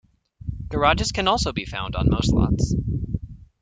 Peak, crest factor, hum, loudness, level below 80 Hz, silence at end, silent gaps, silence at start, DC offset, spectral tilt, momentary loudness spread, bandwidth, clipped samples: -4 dBFS; 20 dB; none; -23 LUFS; -32 dBFS; 0.2 s; none; 0.45 s; under 0.1%; -5.5 dB/octave; 14 LU; 9.4 kHz; under 0.1%